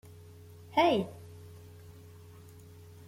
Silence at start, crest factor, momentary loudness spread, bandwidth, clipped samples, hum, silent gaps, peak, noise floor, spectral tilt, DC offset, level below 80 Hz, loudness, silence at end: 0.7 s; 22 dB; 26 LU; 16.5 kHz; under 0.1%; none; none; -14 dBFS; -52 dBFS; -6 dB/octave; under 0.1%; -70 dBFS; -29 LUFS; 1.15 s